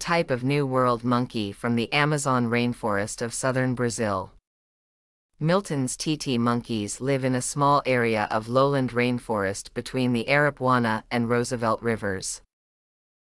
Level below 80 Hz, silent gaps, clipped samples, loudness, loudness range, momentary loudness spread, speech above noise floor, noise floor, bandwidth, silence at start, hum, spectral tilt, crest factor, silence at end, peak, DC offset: -54 dBFS; 4.47-5.29 s; under 0.1%; -25 LUFS; 4 LU; 7 LU; over 66 dB; under -90 dBFS; 12 kHz; 0 s; none; -5 dB/octave; 18 dB; 0.85 s; -8 dBFS; under 0.1%